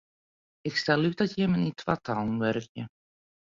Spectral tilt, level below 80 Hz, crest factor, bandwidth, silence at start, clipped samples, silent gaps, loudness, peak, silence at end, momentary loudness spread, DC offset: -6.5 dB/octave; -62 dBFS; 20 dB; 7.6 kHz; 0.65 s; under 0.1%; 2.69-2.75 s; -28 LUFS; -8 dBFS; 0.55 s; 14 LU; under 0.1%